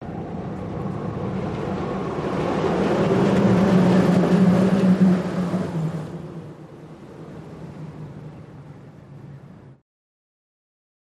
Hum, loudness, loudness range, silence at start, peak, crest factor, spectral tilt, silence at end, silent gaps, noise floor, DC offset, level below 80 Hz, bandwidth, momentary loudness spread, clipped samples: none; -21 LUFS; 22 LU; 0 s; -6 dBFS; 16 dB; -8 dB/octave; 1.35 s; none; -43 dBFS; under 0.1%; -48 dBFS; 10.5 kHz; 24 LU; under 0.1%